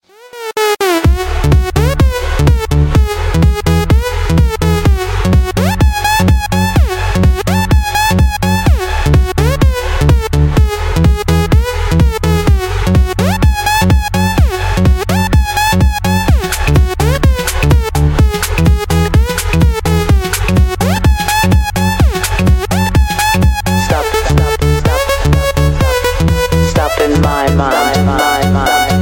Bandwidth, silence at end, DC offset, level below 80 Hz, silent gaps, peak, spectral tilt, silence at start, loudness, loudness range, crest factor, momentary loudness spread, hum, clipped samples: 17 kHz; 0 s; under 0.1%; -14 dBFS; none; 0 dBFS; -5.5 dB/octave; 0.25 s; -12 LUFS; 0 LU; 10 dB; 2 LU; none; under 0.1%